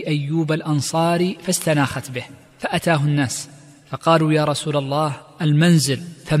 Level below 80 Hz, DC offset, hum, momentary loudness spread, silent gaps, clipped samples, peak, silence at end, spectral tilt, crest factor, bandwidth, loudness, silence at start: -54 dBFS; under 0.1%; none; 13 LU; none; under 0.1%; -4 dBFS; 0 s; -5.5 dB/octave; 16 dB; 15 kHz; -20 LUFS; 0 s